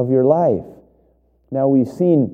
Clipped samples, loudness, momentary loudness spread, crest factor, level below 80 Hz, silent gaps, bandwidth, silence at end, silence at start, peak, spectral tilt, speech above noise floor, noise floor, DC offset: under 0.1%; -17 LUFS; 9 LU; 16 dB; -56 dBFS; none; 7.6 kHz; 0 s; 0 s; -2 dBFS; -11 dB/octave; 42 dB; -58 dBFS; under 0.1%